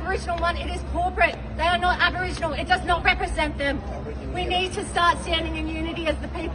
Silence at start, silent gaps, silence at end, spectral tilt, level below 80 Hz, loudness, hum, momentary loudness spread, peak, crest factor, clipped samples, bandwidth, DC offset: 0 s; none; 0 s; -4.5 dB/octave; -34 dBFS; -24 LUFS; none; 8 LU; -6 dBFS; 18 dB; under 0.1%; 10.5 kHz; under 0.1%